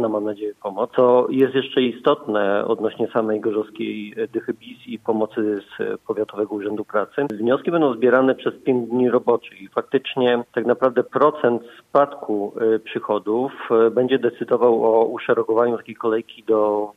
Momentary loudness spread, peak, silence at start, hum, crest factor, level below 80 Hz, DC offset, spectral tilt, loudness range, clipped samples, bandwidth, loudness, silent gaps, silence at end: 10 LU; -4 dBFS; 0 s; none; 18 dB; -70 dBFS; under 0.1%; -7.5 dB/octave; 5 LU; under 0.1%; 4 kHz; -21 LUFS; none; 0.05 s